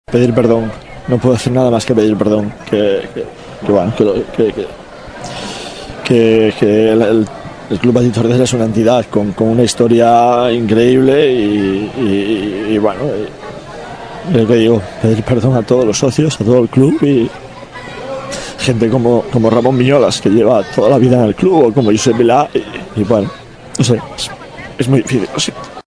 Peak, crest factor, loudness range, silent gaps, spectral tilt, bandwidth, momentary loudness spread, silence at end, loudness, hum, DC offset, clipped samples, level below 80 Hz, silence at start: 0 dBFS; 12 dB; 5 LU; none; -6 dB/octave; 11 kHz; 15 LU; 0.05 s; -12 LUFS; none; under 0.1%; 0.4%; -40 dBFS; 0.1 s